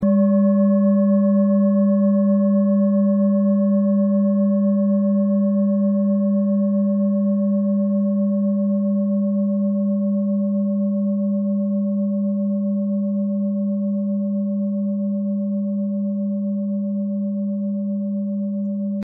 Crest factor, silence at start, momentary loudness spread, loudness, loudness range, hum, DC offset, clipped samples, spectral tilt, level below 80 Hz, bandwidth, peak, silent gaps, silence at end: 10 dB; 0 s; 7 LU; -20 LUFS; 6 LU; none; under 0.1%; under 0.1%; -12 dB/octave; -70 dBFS; 1.8 kHz; -8 dBFS; none; 0 s